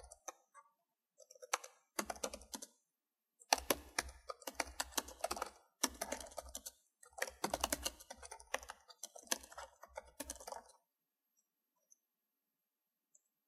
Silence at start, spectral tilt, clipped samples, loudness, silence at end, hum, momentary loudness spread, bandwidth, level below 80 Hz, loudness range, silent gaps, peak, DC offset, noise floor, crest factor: 0 s; -1 dB/octave; under 0.1%; -43 LUFS; 2.8 s; none; 16 LU; 15.5 kHz; -66 dBFS; 12 LU; none; -10 dBFS; under 0.1%; under -90 dBFS; 36 dB